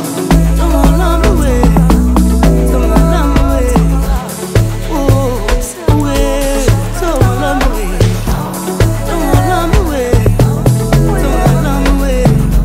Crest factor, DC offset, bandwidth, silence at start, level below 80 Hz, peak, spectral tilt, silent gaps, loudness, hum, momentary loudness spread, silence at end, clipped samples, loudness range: 10 dB; under 0.1%; 16.5 kHz; 0 s; -14 dBFS; 0 dBFS; -6.5 dB/octave; none; -12 LUFS; none; 5 LU; 0 s; under 0.1%; 3 LU